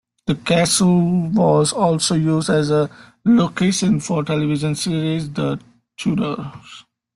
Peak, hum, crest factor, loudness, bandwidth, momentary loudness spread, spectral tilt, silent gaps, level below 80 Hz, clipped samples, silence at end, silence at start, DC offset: -4 dBFS; none; 14 dB; -18 LUFS; 12.5 kHz; 10 LU; -5.5 dB/octave; none; -52 dBFS; under 0.1%; 0.35 s; 0.25 s; under 0.1%